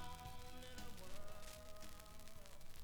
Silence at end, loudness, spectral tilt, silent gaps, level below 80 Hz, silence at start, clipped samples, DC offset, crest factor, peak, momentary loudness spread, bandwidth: 0 s; -57 LUFS; -3.5 dB/octave; none; -58 dBFS; 0 s; under 0.1%; under 0.1%; 14 dB; -34 dBFS; 5 LU; over 20 kHz